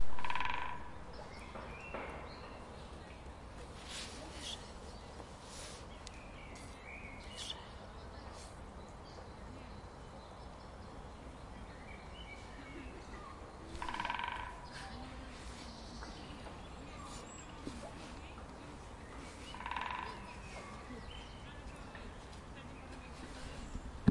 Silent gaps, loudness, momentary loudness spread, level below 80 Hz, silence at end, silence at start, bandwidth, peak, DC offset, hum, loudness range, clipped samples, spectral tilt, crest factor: none; -47 LUFS; 10 LU; -54 dBFS; 0 s; 0 s; 11.5 kHz; -12 dBFS; under 0.1%; none; 6 LU; under 0.1%; -4.5 dB/octave; 30 dB